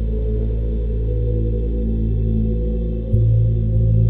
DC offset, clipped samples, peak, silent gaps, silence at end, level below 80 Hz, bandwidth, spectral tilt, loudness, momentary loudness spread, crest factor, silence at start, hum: under 0.1%; under 0.1%; -4 dBFS; none; 0 s; -20 dBFS; 1.1 kHz; -13 dB/octave; -20 LUFS; 6 LU; 14 dB; 0 s; none